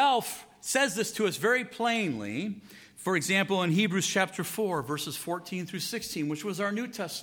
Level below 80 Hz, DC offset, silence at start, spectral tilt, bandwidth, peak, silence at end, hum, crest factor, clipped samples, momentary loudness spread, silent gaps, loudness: -72 dBFS; under 0.1%; 0 s; -3.5 dB/octave; 19.5 kHz; -10 dBFS; 0 s; none; 20 dB; under 0.1%; 10 LU; none; -29 LUFS